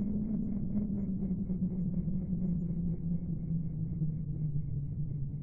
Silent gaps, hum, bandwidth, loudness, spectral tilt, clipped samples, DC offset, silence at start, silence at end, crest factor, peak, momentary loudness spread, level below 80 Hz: none; none; 2.2 kHz; -35 LUFS; -15 dB/octave; under 0.1%; 0.3%; 0 s; 0 s; 12 dB; -22 dBFS; 3 LU; -44 dBFS